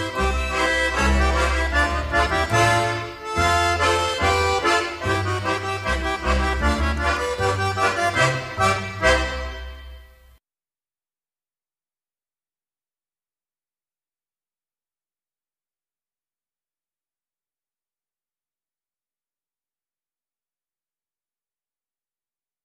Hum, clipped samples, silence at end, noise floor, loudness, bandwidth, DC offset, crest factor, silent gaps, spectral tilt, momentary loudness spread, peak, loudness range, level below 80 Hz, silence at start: none; under 0.1%; 12.6 s; under -90 dBFS; -21 LUFS; 15 kHz; under 0.1%; 20 dB; none; -4 dB/octave; 6 LU; -4 dBFS; 6 LU; -32 dBFS; 0 s